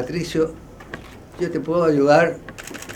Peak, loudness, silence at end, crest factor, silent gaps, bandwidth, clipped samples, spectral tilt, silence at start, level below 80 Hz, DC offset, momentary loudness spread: -2 dBFS; -19 LUFS; 0 s; 18 dB; none; 18 kHz; under 0.1%; -6 dB/octave; 0 s; -48 dBFS; under 0.1%; 22 LU